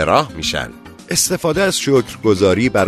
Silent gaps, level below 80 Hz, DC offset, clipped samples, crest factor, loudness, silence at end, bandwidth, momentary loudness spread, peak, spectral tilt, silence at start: none; -42 dBFS; under 0.1%; under 0.1%; 16 dB; -16 LUFS; 0 s; 13.5 kHz; 6 LU; 0 dBFS; -4 dB/octave; 0 s